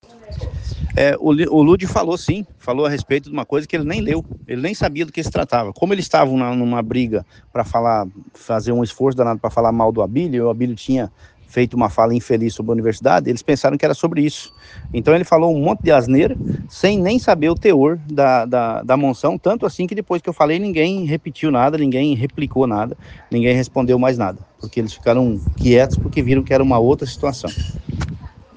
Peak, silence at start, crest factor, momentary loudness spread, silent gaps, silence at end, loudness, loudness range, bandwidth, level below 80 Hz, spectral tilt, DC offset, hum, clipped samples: 0 dBFS; 0.25 s; 16 dB; 11 LU; none; 0.3 s; -17 LUFS; 4 LU; 9.4 kHz; -38 dBFS; -7 dB/octave; under 0.1%; none; under 0.1%